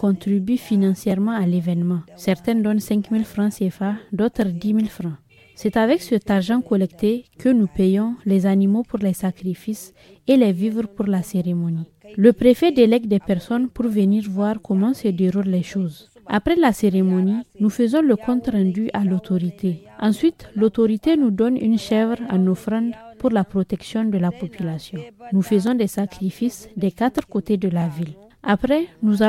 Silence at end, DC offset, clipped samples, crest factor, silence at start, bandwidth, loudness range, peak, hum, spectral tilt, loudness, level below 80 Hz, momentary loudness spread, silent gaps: 0 s; under 0.1%; under 0.1%; 18 dB; 0 s; 14.5 kHz; 4 LU; -2 dBFS; none; -7.5 dB/octave; -20 LUFS; -50 dBFS; 9 LU; none